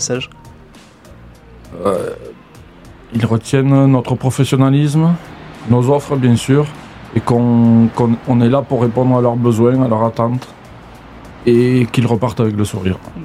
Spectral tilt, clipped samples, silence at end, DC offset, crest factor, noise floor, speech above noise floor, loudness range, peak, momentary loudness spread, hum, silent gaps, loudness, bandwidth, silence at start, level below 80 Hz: -7 dB/octave; under 0.1%; 0 s; 0.1%; 14 dB; -41 dBFS; 28 dB; 4 LU; 0 dBFS; 11 LU; none; none; -14 LUFS; 14 kHz; 0 s; -46 dBFS